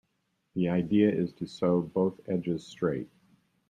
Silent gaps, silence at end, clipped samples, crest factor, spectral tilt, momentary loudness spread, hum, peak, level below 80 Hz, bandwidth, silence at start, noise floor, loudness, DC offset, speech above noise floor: none; 0.65 s; under 0.1%; 18 dB; -8.5 dB/octave; 10 LU; none; -12 dBFS; -66 dBFS; 9.2 kHz; 0.55 s; -77 dBFS; -29 LUFS; under 0.1%; 49 dB